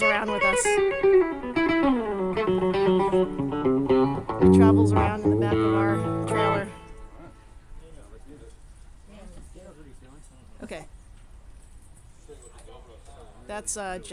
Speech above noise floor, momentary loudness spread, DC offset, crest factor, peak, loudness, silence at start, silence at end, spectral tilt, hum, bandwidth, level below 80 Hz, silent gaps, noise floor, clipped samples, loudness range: 27 dB; 16 LU; under 0.1%; 20 dB; -6 dBFS; -23 LUFS; 0 s; 0 s; -6 dB/octave; none; 12 kHz; -46 dBFS; none; -48 dBFS; under 0.1%; 15 LU